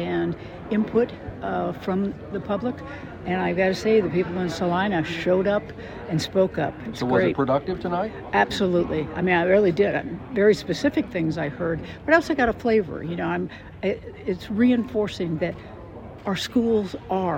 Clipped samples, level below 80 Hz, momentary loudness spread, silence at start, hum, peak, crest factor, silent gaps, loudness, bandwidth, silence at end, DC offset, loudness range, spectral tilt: under 0.1%; -48 dBFS; 10 LU; 0 s; none; -6 dBFS; 18 dB; none; -24 LUFS; 16 kHz; 0 s; under 0.1%; 4 LU; -6.5 dB/octave